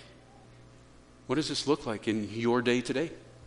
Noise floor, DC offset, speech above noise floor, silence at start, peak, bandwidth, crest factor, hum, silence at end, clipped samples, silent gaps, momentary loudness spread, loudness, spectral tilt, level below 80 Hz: -55 dBFS; under 0.1%; 26 dB; 0 s; -14 dBFS; 10.5 kHz; 20 dB; none; 0 s; under 0.1%; none; 6 LU; -30 LUFS; -5 dB/octave; -60 dBFS